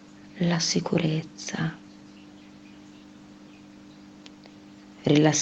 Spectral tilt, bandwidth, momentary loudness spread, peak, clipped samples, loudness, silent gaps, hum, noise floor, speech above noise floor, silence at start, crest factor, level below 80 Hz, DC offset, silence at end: -4.5 dB/octave; 8.4 kHz; 25 LU; -8 dBFS; under 0.1%; -26 LUFS; none; none; -48 dBFS; 24 dB; 0.25 s; 22 dB; -64 dBFS; under 0.1%; 0 s